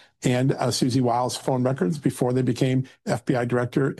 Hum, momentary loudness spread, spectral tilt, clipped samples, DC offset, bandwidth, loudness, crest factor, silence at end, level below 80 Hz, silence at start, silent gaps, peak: none; 3 LU; -6 dB/octave; under 0.1%; under 0.1%; 12.5 kHz; -24 LUFS; 16 dB; 0.05 s; -60 dBFS; 0.2 s; none; -8 dBFS